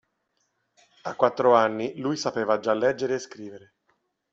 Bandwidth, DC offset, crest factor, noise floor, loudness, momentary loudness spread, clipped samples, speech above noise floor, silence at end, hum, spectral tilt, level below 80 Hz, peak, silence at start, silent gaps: 7.8 kHz; under 0.1%; 20 dB; -74 dBFS; -24 LUFS; 19 LU; under 0.1%; 50 dB; 0.75 s; none; -5 dB/octave; -70 dBFS; -6 dBFS; 1.05 s; none